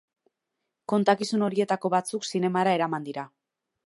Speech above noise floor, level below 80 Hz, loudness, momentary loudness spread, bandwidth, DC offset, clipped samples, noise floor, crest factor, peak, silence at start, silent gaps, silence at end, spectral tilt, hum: 58 dB; -78 dBFS; -26 LUFS; 13 LU; 11.5 kHz; under 0.1%; under 0.1%; -83 dBFS; 20 dB; -8 dBFS; 0.9 s; none; 0.6 s; -5.5 dB/octave; none